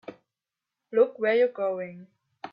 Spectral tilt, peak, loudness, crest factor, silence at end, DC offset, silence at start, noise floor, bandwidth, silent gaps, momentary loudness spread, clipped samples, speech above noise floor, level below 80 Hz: -7.5 dB/octave; -10 dBFS; -25 LUFS; 18 dB; 0.05 s; under 0.1%; 0.1 s; -88 dBFS; 5.2 kHz; none; 20 LU; under 0.1%; 63 dB; -80 dBFS